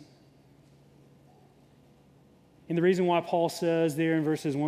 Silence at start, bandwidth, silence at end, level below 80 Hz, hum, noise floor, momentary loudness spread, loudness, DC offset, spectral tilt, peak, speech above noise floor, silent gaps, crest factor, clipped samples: 0 s; 15.5 kHz; 0 s; -74 dBFS; none; -59 dBFS; 4 LU; -27 LUFS; under 0.1%; -6.5 dB/octave; -12 dBFS; 33 dB; none; 18 dB; under 0.1%